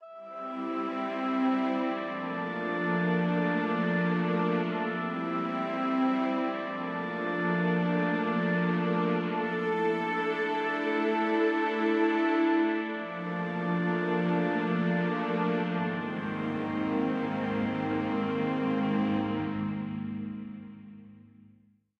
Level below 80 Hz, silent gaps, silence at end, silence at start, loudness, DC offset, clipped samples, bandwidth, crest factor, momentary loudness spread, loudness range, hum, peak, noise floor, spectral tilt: -70 dBFS; none; 0.8 s; 0 s; -29 LUFS; under 0.1%; under 0.1%; 6.6 kHz; 14 dB; 7 LU; 3 LU; none; -16 dBFS; -63 dBFS; -8.5 dB/octave